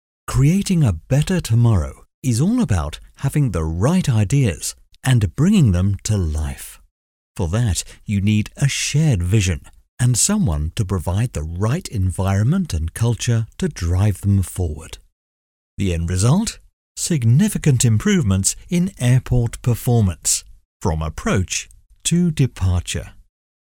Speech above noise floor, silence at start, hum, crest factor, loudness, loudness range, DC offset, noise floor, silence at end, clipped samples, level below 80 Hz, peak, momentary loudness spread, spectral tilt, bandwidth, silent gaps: over 72 dB; 0.3 s; none; 16 dB; -19 LUFS; 4 LU; under 0.1%; under -90 dBFS; 0.45 s; under 0.1%; -34 dBFS; -2 dBFS; 10 LU; -5.5 dB/octave; 17 kHz; 2.14-2.22 s, 6.91-7.35 s, 9.88-9.97 s, 15.12-15.77 s, 16.73-16.95 s, 20.65-20.80 s